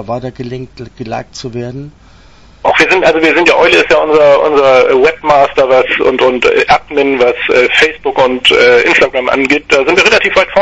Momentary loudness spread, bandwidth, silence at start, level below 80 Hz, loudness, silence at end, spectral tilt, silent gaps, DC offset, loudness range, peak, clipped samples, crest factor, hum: 15 LU; 11 kHz; 0 s; -40 dBFS; -8 LUFS; 0 s; -4 dB/octave; none; under 0.1%; 4 LU; 0 dBFS; 0.5%; 10 dB; none